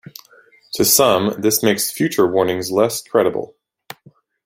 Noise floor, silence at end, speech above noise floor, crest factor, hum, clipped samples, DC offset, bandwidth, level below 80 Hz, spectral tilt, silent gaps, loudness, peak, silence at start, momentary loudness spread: -51 dBFS; 1 s; 35 dB; 18 dB; none; under 0.1%; under 0.1%; 16.5 kHz; -58 dBFS; -3.5 dB/octave; none; -16 LUFS; 0 dBFS; 0.75 s; 8 LU